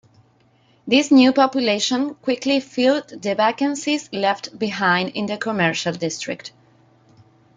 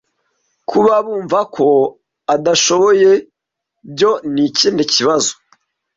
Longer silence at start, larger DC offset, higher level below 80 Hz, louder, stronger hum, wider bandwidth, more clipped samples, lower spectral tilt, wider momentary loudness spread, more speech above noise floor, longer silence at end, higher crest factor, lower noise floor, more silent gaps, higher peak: first, 0.85 s vs 0.7 s; neither; second, -66 dBFS vs -58 dBFS; second, -20 LUFS vs -14 LUFS; neither; first, 9.4 kHz vs 8 kHz; neither; about the same, -4 dB/octave vs -3 dB/octave; first, 11 LU vs 8 LU; second, 38 dB vs 65 dB; first, 1.05 s vs 0.65 s; about the same, 18 dB vs 14 dB; second, -58 dBFS vs -78 dBFS; neither; about the same, -2 dBFS vs -2 dBFS